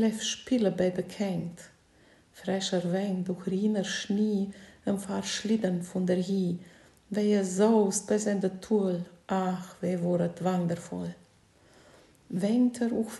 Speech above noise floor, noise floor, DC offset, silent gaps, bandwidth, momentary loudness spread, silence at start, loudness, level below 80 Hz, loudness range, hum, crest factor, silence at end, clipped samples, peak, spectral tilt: 33 dB; -61 dBFS; under 0.1%; none; 12.5 kHz; 10 LU; 0 s; -29 LUFS; -68 dBFS; 4 LU; none; 18 dB; 0 s; under 0.1%; -12 dBFS; -5.5 dB/octave